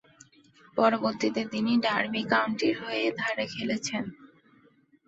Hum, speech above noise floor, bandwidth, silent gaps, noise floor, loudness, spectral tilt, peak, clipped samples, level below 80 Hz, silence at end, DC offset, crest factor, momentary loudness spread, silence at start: none; 34 dB; 8 kHz; none; -62 dBFS; -28 LUFS; -4 dB/octave; -8 dBFS; under 0.1%; -70 dBFS; 0.8 s; under 0.1%; 20 dB; 7 LU; 0.75 s